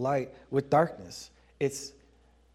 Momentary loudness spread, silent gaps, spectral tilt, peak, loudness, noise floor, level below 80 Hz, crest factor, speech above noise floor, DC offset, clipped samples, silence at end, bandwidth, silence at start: 18 LU; none; -5.5 dB/octave; -10 dBFS; -30 LUFS; -62 dBFS; -62 dBFS; 20 dB; 32 dB; under 0.1%; under 0.1%; 0.65 s; 15 kHz; 0 s